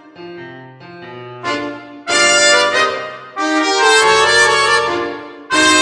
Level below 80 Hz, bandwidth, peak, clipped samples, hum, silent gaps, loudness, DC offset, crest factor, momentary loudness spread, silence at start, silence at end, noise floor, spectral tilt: -54 dBFS; 10 kHz; 0 dBFS; under 0.1%; none; none; -12 LUFS; under 0.1%; 14 dB; 23 LU; 0.2 s; 0 s; -35 dBFS; -1 dB/octave